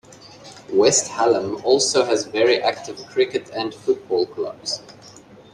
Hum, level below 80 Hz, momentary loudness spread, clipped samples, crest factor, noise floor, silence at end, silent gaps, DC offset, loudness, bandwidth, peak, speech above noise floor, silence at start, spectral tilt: none; -64 dBFS; 11 LU; under 0.1%; 18 dB; -45 dBFS; 0.35 s; none; under 0.1%; -20 LUFS; 11.5 kHz; -4 dBFS; 25 dB; 0.25 s; -2.5 dB/octave